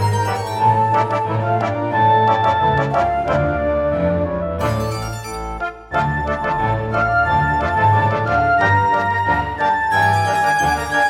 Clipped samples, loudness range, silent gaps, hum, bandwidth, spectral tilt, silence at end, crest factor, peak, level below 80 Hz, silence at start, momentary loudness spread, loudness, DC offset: under 0.1%; 4 LU; none; none; 15.5 kHz; -6 dB/octave; 0 s; 14 dB; -4 dBFS; -36 dBFS; 0 s; 7 LU; -17 LUFS; under 0.1%